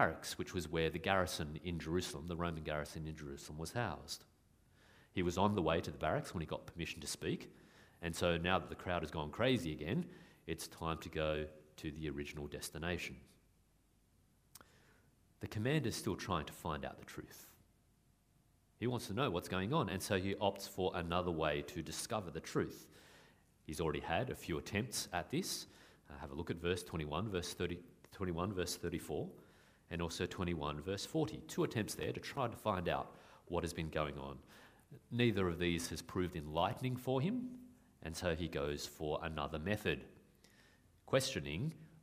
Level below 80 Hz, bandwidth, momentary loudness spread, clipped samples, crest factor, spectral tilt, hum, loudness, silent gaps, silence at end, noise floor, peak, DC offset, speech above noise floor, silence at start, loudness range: -60 dBFS; 15.5 kHz; 13 LU; under 0.1%; 26 dB; -5 dB/octave; none; -40 LUFS; none; 0.05 s; -73 dBFS; -14 dBFS; under 0.1%; 33 dB; 0 s; 5 LU